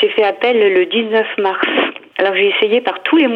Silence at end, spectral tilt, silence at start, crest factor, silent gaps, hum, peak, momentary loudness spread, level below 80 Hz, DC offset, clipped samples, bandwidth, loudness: 0 s; -6 dB/octave; 0 s; 14 dB; none; none; 0 dBFS; 5 LU; -76 dBFS; under 0.1%; under 0.1%; 5.2 kHz; -14 LUFS